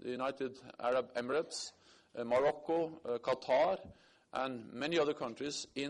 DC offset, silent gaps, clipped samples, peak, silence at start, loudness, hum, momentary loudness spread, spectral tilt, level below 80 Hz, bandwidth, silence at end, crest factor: under 0.1%; none; under 0.1%; -22 dBFS; 0 s; -36 LUFS; none; 11 LU; -4 dB/octave; -74 dBFS; 11 kHz; 0 s; 14 dB